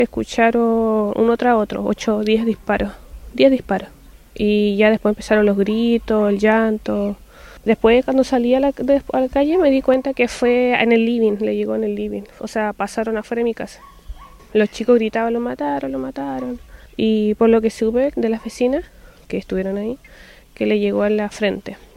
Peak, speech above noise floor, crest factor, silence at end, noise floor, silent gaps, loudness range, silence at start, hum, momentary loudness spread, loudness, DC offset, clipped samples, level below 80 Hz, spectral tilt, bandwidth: 0 dBFS; 19 dB; 18 dB; 0.2 s; -36 dBFS; none; 5 LU; 0 s; none; 11 LU; -18 LUFS; under 0.1%; under 0.1%; -42 dBFS; -6 dB/octave; 13.5 kHz